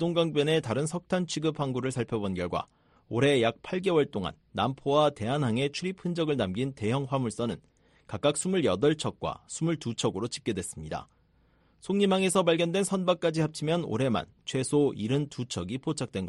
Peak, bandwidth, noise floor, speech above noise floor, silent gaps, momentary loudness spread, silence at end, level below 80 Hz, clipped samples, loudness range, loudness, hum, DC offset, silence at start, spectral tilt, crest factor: -10 dBFS; 11.5 kHz; -65 dBFS; 37 dB; none; 10 LU; 0 s; -60 dBFS; under 0.1%; 3 LU; -29 LUFS; none; under 0.1%; 0 s; -5.5 dB/octave; 18 dB